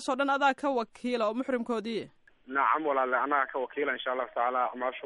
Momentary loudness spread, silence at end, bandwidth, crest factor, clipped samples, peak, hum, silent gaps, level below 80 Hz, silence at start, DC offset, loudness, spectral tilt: 7 LU; 0 s; 11.5 kHz; 18 dB; under 0.1%; -12 dBFS; none; none; -74 dBFS; 0 s; under 0.1%; -29 LUFS; -4 dB/octave